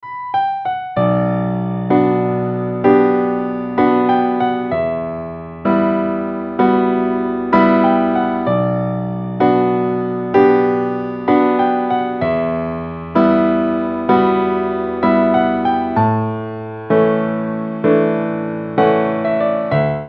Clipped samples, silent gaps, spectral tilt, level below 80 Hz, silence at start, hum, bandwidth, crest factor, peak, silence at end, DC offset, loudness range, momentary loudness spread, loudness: under 0.1%; none; -10 dB/octave; -48 dBFS; 0.05 s; none; 5.6 kHz; 16 dB; 0 dBFS; 0 s; under 0.1%; 2 LU; 8 LU; -16 LUFS